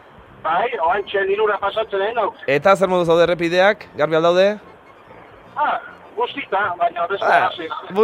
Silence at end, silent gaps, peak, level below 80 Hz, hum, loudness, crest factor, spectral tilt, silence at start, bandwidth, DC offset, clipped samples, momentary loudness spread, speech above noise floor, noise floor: 0 s; none; 0 dBFS; -56 dBFS; none; -18 LUFS; 18 dB; -5.5 dB/octave; 0.2 s; 14 kHz; under 0.1%; under 0.1%; 9 LU; 26 dB; -44 dBFS